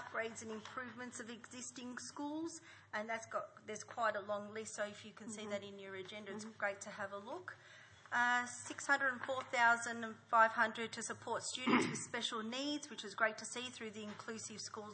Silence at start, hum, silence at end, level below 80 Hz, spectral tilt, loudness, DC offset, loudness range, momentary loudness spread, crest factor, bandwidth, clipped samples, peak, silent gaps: 0 s; none; 0 s; -88 dBFS; -2.5 dB/octave; -40 LUFS; under 0.1%; 10 LU; 15 LU; 24 dB; 8.4 kHz; under 0.1%; -16 dBFS; none